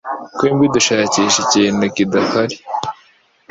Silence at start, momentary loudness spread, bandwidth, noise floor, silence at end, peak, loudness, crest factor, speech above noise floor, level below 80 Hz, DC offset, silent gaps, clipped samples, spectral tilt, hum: 0.05 s; 11 LU; 8 kHz; -52 dBFS; 0.6 s; -2 dBFS; -15 LUFS; 16 dB; 38 dB; -54 dBFS; under 0.1%; none; under 0.1%; -3.5 dB/octave; none